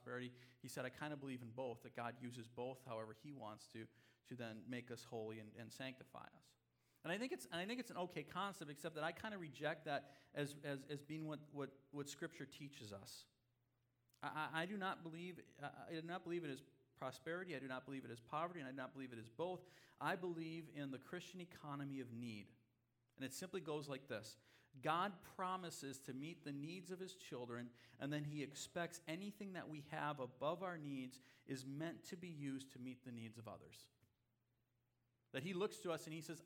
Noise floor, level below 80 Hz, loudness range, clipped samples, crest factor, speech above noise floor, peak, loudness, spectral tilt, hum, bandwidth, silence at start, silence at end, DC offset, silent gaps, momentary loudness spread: -85 dBFS; -88 dBFS; 5 LU; under 0.1%; 24 dB; 36 dB; -26 dBFS; -50 LUFS; -5 dB/octave; none; 19.5 kHz; 0 s; 0 s; under 0.1%; none; 10 LU